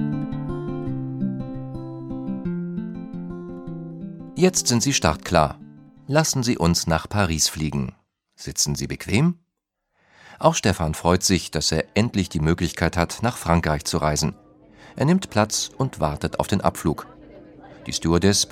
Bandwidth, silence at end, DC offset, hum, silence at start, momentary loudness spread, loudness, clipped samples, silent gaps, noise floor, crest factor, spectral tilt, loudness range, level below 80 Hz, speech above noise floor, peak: 16.5 kHz; 0 s; under 0.1%; none; 0 s; 14 LU; -22 LUFS; under 0.1%; none; -78 dBFS; 22 dB; -4.5 dB/octave; 6 LU; -40 dBFS; 57 dB; -2 dBFS